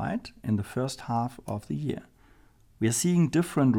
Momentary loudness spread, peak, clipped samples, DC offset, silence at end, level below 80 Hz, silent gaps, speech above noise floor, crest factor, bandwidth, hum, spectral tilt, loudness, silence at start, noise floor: 10 LU; -12 dBFS; under 0.1%; under 0.1%; 0 s; -58 dBFS; none; 31 dB; 16 dB; 17 kHz; none; -6 dB/octave; -29 LUFS; 0 s; -58 dBFS